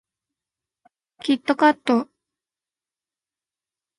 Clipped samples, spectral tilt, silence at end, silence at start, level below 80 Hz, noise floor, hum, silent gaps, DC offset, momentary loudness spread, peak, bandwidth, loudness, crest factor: under 0.1%; -4.5 dB/octave; 1.95 s; 1.25 s; -76 dBFS; under -90 dBFS; none; none; under 0.1%; 13 LU; -4 dBFS; 11.5 kHz; -21 LUFS; 22 dB